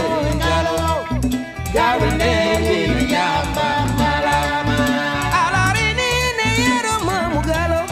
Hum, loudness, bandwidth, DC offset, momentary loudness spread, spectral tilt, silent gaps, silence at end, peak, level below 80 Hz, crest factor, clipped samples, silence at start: none; -18 LUFS; 16 kHz; under 0.1%; 4 LU; -4.5 dB/octave; none; 0 s; -4 dBFS; -30 dBFS; 14 dB; under 0.1%; 0 s